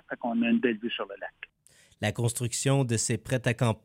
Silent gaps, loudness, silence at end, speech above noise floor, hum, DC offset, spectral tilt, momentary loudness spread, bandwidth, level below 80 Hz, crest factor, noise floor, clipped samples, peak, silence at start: none; -28 LUFS; 0.05 s; 33 dB; none; under 0.1%; -5 dB/octave; 14 LU; 16 kHz; -62 dBFS; 18 dB; -61 dBFS; under 0.1%; -12 dBFS; 0.1 s